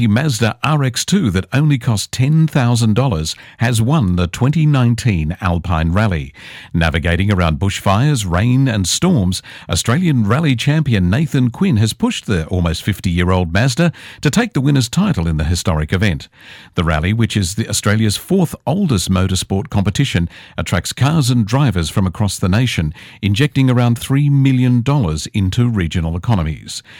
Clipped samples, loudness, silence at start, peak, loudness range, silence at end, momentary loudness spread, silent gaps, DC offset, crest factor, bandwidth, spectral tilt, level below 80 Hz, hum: under 0.1%; -16 LUFS; 0 s; -2 dBFS; 2 LU; 0 s; 5 LU; none; under 0.1%; 12 dB; 17.5 kHz; -5.5 dB/octave; -36 dBFS; none